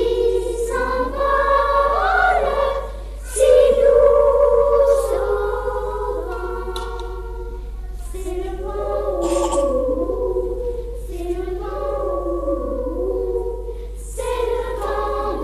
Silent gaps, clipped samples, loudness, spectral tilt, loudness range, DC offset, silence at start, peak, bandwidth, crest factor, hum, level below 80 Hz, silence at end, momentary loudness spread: none; under 0.1%; -19 LUFS; -5 dB/octave; 10 LU; under 0.1%; 0 s; -4 dBFS; 14 kHz; 16 dB; none; -30 dBFS; 0 s; 17 LU